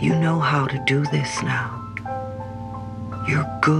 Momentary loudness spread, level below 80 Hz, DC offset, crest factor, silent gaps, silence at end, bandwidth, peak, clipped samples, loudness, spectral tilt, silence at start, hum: 13 LU; -48 dBFS; under 0.1%; 20 dB; none; 0 s; 10.5 kHz; -2 dBFS; under 0.1%; -23 LUFS; -6 dB/octave; 0 s; none